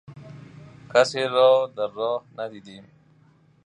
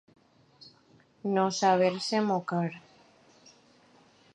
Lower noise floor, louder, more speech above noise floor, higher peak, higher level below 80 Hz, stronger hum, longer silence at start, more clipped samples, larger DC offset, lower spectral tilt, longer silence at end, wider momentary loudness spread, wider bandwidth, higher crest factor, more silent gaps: second, -58 dBFS vs -62 dBFS; first, -22 LUFS vs -28 LUFS; about the same, 36 dB vs 35 dB; first, -4 dBFS vs -10 dBFS; first, -70 dBFS vs -80 dBFS; neither; second, 0.1 s vs 0.65 s; neither; neither; about the same, -4 dB/octave vs -5 dB/octave; second, 0.85 s vs 1.55 s; first, 26 LU vs 12 LU; about the same, 10 kHz vs 10.5 kHz; about the same, 20 dB vs 20 dB; neither